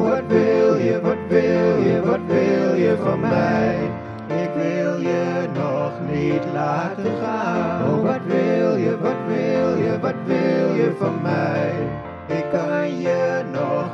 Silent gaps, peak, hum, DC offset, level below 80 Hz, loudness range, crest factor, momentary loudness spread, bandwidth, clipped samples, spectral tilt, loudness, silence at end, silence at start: none; -4 dBFS; none; under 0.1%; -54 dBFS; 4 LU; 16 dB; 6 LU; 7.6 kHz; under 0.1%; -8 dB/octave; -20 LUFS; 0 s; 0 s